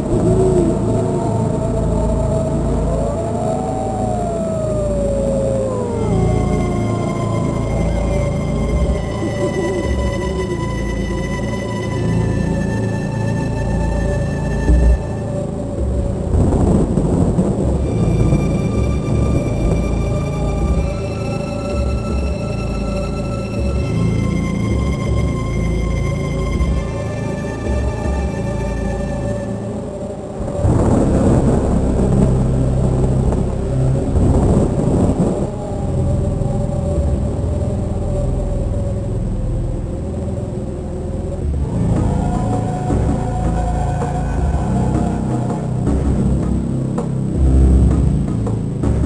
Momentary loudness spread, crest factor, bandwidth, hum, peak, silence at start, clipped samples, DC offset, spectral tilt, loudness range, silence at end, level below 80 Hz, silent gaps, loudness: 7 LU; 16 dB; 11 kHz; none; 0 dBFS; 0 s; under 0.1%; under 0.1%; -8 dB/octave; 5 LU; 0 s; -22 dBFS; none; -18 LUFS